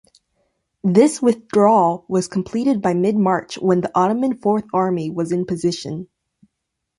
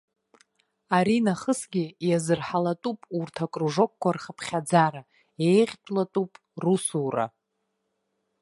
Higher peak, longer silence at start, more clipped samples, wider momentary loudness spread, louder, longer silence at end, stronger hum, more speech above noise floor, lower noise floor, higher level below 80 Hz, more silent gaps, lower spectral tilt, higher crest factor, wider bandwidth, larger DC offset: first, -2 dBFS vs -6 dBFS; about the same, 0.85 s vs 0.9 s; neither; about the same, 8 LU vs 10 LU; first, -18 LUFS vs -26 LUFS; second, 0.95 s vs 1.15 s; neither; first, 60 dB vs 53 dB; about the same, -78 dBFS vs -78 dBFS; first, -60 dBFS vs -70 dBFS; neither; about the same, -6.5 dB/octave vs -5.5 dB/octave; about the same, 18 dB vs 20 dB; about the same, 11.5 kHz vs 11.5 kHz; neither